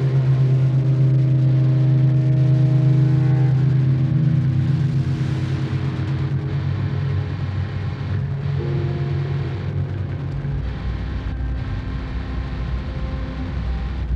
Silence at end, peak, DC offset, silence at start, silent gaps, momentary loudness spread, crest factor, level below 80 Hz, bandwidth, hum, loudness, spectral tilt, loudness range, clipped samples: 0 s; -8 dBFS; under 0.1%; 0 s; none; 10 LU; 12 dB; -32 dBFS; 5.4 kHz; none; -20 LUFS; -9.5 dB/octave; 10 LU; under 0.1%